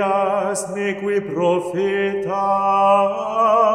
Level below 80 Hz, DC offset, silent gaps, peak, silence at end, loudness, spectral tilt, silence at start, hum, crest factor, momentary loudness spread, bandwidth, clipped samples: -60 dBFS; under 0.1%; none; -4 dBFS; 0 s; -19 LUFS; -5 dB/octave; 0 s; none; 14 dB; 7 LU; 13.5 kHz; under 0.1%